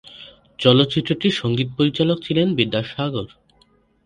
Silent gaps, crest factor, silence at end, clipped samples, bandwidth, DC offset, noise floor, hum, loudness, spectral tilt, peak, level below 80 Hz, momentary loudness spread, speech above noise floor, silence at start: none; 20 dB; 0.8 s; under 0.1%; 10.5 kHz; under 0.1%; -58 dBFS; none; -19 LUFS; -7 dB/octave; 0 dBFS; -54 dBFS; 14 LU; 39 dB; 0.1 s